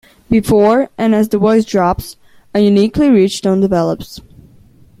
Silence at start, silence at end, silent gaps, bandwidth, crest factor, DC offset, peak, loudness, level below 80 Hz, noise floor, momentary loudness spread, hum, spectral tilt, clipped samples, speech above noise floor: 0.3 s; 0.8 s; none; 15 kHz; 12 dB; under 0.1%; -2 dBFS; -13 LUFS; -40 dBFS; -44 dBFS; 10 LU; none; -6.5 dB/octave; under 0.1%; 32 dB